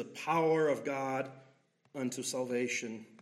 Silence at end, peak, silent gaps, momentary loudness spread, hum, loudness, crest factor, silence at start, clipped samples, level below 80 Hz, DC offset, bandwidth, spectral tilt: 0.15 s; -18 dBFS; none; 13 LU; none; -34 LUFS; 16 dB; 0 s; under 0.1%; -86 dBFS; under 0.1%; 15.5 kHz; -4.5 dB/octave